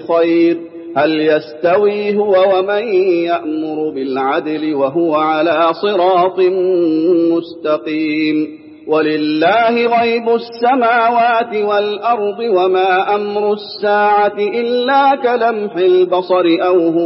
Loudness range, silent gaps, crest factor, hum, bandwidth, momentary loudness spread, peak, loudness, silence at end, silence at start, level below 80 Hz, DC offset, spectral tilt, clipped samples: 2 LU; none; 12 dB; none; 5.8 kHz; 6 LU; -2 dBFS; -14 LUFS; 0 s; 0 s; -70 dBFS; under 0.1%; -10 dB/octave; under 0.1%